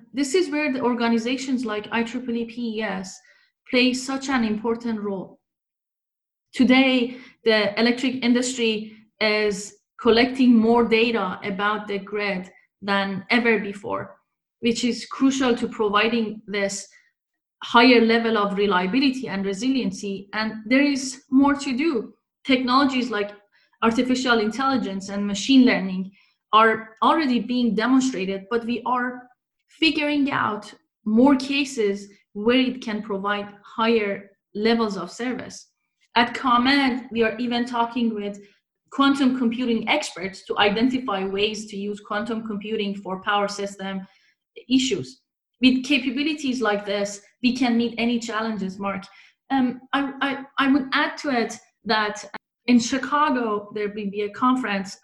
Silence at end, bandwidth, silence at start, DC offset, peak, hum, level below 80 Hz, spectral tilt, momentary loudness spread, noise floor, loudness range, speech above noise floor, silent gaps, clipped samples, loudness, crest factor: 0.1 s; 11.5 kHz; 0.15 s; under 0.1%; -2 dBFS; none; -60 dBFS; -4 dB/octave; 12 LU; -87 dBFS; 5 LU; 65 dB; none; under 0.1%; -22 LUFS; 20 dB